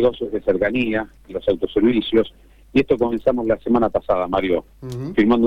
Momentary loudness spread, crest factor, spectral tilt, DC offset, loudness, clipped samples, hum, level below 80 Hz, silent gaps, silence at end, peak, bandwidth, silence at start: 7 LU; 14 dB; -7.5 dB/octave; under 0.1%; -20 LUFS; under 0.1%; none; -42 dBFS; none; 0 s; -4 dBFS; 7.4 kHz; 0 s